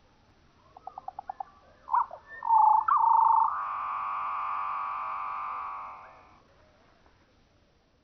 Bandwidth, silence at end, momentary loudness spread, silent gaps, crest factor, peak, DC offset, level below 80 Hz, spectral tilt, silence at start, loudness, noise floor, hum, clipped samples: 5.8 kHz; 1.95 s; 22 LU; none; 16 dB; -14 dBFS; under 0.1%; -68 dBFS; -1 dB/octave; 1.9 s; -27 LUFS; -65 dBFS; none; under 0.1%